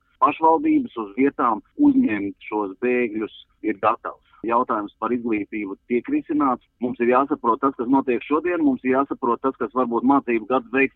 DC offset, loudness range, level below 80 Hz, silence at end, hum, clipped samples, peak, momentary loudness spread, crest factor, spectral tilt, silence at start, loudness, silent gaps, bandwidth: under 0.1%; 3 LU; -60 dBFS; 0.05 s; none; under 0.1%; -6 dBFS; 10 LU; 16 dB; -9.5 dB/octave; 0.2 s; -22 LUFS; none; 4 kHz